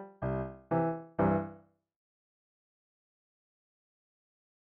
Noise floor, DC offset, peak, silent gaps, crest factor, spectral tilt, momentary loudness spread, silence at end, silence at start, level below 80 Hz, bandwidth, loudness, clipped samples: -56 dBFS; under 0.1%; -16 dBFS; none; 20 dB; -9.5 dB/octave; 7 LU; 3.15 s; 0 s; -58 dBFS; 3.8 kHz; -33 LUFS; under 0.1%